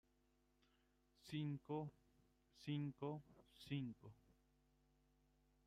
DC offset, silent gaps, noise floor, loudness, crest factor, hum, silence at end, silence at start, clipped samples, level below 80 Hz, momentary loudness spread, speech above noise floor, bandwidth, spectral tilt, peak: under 0.1%; none; -81 dBFS; -50 LUFS; 18 dB; none; 1.55 s; 1.25 s; under 0.1%; -80 dBFS; 17 LU; 32 dB; 13.5 kHz; -7.5 dB/octave; -36 dBFS